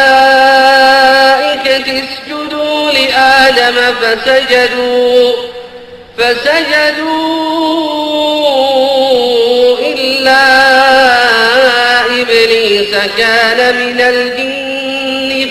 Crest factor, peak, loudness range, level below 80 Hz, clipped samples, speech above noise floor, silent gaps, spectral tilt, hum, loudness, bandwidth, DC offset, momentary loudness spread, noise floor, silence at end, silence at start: 8 dB; 0 dBFS; 4 LU; -46 dBFS; under 0.1%; 21 dB; none; -2 dB/octave; none; -8 LUFS; 13.5 kHz; under 0.1%; 9 LU; -31 dBFS; 0 s; 0 s